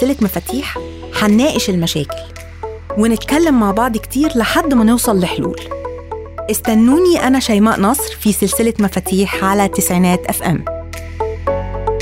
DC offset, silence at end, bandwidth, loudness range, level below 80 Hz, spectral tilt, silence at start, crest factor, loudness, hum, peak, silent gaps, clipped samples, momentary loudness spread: under 0.1%; 0 s; 16.5 kHz; 3 LU; -34 dBFS; -5 dB/octave; 0 s; 12 dB; -15 LUFS; none; -2 dBFS; none; under 0.1%; 14 LU